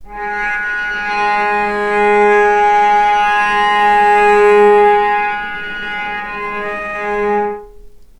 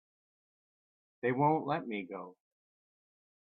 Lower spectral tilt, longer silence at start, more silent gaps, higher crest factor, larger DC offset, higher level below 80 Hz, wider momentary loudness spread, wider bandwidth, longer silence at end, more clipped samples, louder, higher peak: second, -4 dB/octave vs -10 dB/octave; second, 0 s vs 1.25 s; neither; second, 14 dB vs 22 dB; neither; first, -42 dBFS vs -82 dBFS; second, 12 LU vs 16 LU; first, 10.5 kHz vs 4.5 kHz; second, 0.15 s vs 1.2 s; neither; first, -13 LUFS vs -33 LUFS; first, 0 dBFS vs -16 dBFS